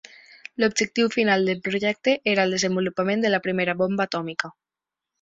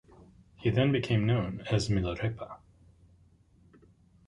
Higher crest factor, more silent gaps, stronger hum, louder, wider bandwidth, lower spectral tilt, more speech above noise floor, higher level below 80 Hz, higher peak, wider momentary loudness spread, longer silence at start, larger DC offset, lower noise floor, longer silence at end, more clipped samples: about the same, 18 dB vs 20 dB; neither; neither; first, -23 LUFS vs -30 LUFS; second, 8.4 kHz vs 10.5 kHz; second, -4 dB/octave vs -7 dB/octave; first, 65 dB vs 34 dB; second, -64 dBFS vs -50 dBFS; first, -6 dBFS vs -12 dBFS; second, 8 LU vs 15 LU; about the same, 0.6 s vs 0.6 s; neither; first, -88 dBFS vs -62 dBFS; second, 0.7 s vs 1.7 s; neither